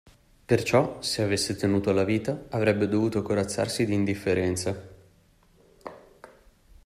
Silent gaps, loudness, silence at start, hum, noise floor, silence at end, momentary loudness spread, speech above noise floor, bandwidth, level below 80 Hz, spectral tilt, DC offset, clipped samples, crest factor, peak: none; -26 LUFS; 0.5 s; none; -60 dBFS; 0.6 s; 10 LU; 35 dB; 15.5 kHz; -56 dBFS; -5.5 dB/octave; under 0.1%; under 0.1%; 20 dB; -8 dBFS